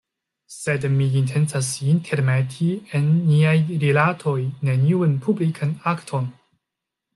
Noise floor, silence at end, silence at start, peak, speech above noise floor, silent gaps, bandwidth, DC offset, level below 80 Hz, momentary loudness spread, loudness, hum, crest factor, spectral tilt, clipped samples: -84 dBFS; 0.85 s; 0.5 s; -6 dBFS; 64 dB; none; 12 kHz; under 0.1%; -62 dBFS; 7 LU; -21 LUFS; none; 16 dB; -6.5 dB/octave; under 0.1%